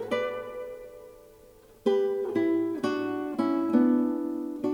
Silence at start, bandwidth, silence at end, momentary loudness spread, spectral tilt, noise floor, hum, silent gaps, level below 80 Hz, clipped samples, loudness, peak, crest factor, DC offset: 0 s; 18 kHz; 0 s; 16 LU; -6.5 dB/octave; -54 dBFS; none; none; -66 dBFS; under 0.1%; -28 LUFS; -12 dBFS; 18 dB; under 0.1%